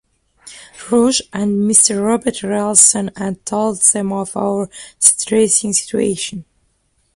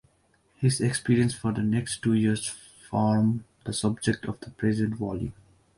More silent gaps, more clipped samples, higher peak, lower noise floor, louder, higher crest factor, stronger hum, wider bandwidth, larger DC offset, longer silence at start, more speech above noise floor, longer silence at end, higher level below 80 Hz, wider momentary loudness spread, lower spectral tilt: neither; neither; first, 0 dBFS vs -10 dBFS; second, -62 dBFS vs -66 dBFS; first, -14 LUFS vs -27 LUFS; about the same, 16 dB vs 18 dB; neither; first, 16 kHz vs 11.5 kHz; neither; second, 0.45 s vs 0.6 s; first, 47 dB vs 40 dB; first, 0.75 s vs 0.45 s; about the same, -54 dBFS vs -54 dBFS; first, 13 LU vs 10 LU; second, -3 dB/octave vs -5.5 dB/octave